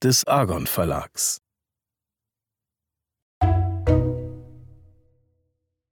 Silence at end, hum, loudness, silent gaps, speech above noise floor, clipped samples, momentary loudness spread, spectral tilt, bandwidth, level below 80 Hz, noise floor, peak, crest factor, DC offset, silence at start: 1.35 s; none; -23 LUFS; 3.22-3.41 s; 66 dB; under 0.1%; 13 LU; -4.5 dB/octave; 19 kHz; -36 dBFS; -88 dBFS; -4 dBFS; 20 dB; under 0.1%; 0 s